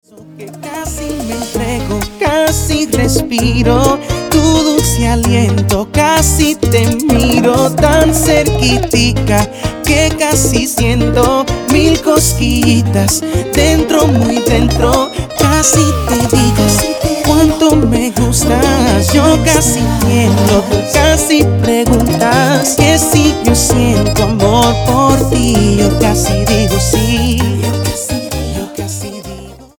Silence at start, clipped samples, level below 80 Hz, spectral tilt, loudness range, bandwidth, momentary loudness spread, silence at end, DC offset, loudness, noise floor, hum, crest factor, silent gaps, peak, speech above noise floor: 0.2 s; under 0.1%; -22 dBFS; -4.5 dB/octave; 3 LU; over 20 kHz; 8 LU; 0.15 s; under 0.1%; -11 LUFS; -31 dBFS; none; 10 dB; none; 0 dBFS; 21 dB